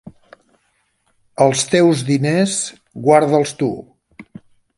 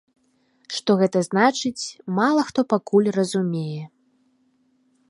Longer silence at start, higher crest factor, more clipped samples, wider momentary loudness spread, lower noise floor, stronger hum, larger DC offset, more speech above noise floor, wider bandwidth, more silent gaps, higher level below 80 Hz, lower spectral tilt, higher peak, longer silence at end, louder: second, 0.05 s vs 0.7 s; about the same, 18 dB vs 20 dB; neither; about the same, 11 LU vs 12 LU; about the same, -65 dBFS vs -64 dBFS; neither; neither; first, 49 dB vs 43 dB; about the same, 11.5 kHz vs 11.5 kHz; neither; first, -60 dBFS vs -70 dBFS; about the same, -5 dB/octave vs -5.5 dB/octave; first, 0 dBFS vs -4 dBFS; second, 0.55 s vs 1.25 s; first, -16 LUFS vs -22 LUFS